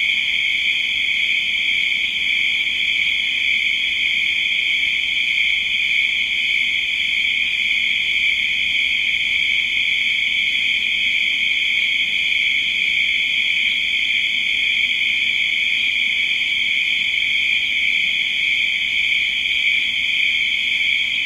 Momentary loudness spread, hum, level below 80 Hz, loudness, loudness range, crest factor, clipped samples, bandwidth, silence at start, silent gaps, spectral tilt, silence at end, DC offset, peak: 1 LU; none; -52 dBFS; -16 LUFS; 0 LU; 14 dB; under 0.1%; 16 kHz; 0 s; none; 1 dB/octave; 0 s; under 0.1%; -6 dBFS